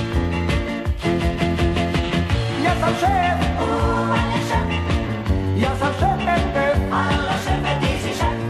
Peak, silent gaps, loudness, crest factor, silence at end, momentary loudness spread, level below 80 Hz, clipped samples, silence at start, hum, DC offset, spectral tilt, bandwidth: -8 dBFS; none; -20 LUFS; 12 dB; 0 s; 3 LU; -28 dBFS; under 0.1%; 0 s; none; under 0.1%; -6 dB/octave; 13.5 kHz